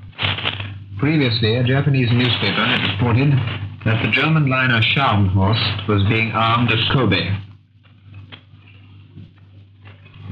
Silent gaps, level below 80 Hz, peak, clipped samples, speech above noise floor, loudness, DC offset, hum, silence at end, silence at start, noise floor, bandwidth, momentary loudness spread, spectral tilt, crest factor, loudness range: none; -50 dBFS; -4 dBFS; under 0.1%; 32 dB; -17 LUFS; under 0.1%; none; 0 s; 0 s; -49 dBFS; 5.4 kHz; 7 LU; -8 dB/octave; 14 dB; 6 LU